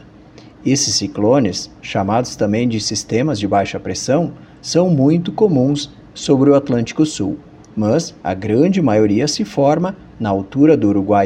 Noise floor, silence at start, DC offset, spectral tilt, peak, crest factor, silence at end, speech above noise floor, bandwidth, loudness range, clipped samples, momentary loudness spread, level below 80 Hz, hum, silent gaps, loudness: -41 dBFS; 0.4 s; under 0.1%; -5.5 dB/octave; 0 dBFS; 16 dB; 0 s; 26 dB; 11.5 kHz; 2 LU; under 0.1%; 10 LU; -48 dBFS; none; none; -16 LUFS